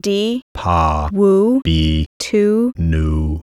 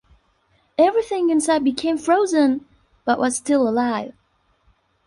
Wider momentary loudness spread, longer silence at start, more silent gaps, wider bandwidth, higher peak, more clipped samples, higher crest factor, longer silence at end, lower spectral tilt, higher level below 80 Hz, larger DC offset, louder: second, 6 LU vs 10 LU; second, 0.05 s vs 0.8 s; first, 0.42-0.55 s, 2.06-2.20 s vs none; first, 13 kHz vs 11.5 kHz; about the same, -2 dBFS vs -4 dBFS; neither; about the same, 12 dB vs 16 dB; second, 0 s vs 0.95 s; first, -6.5 dB/octave vs -3.5 dB/octave; first, -24 dBFS vs -60 dBFS; neither; first, -16 LUFS vs -20 LUFS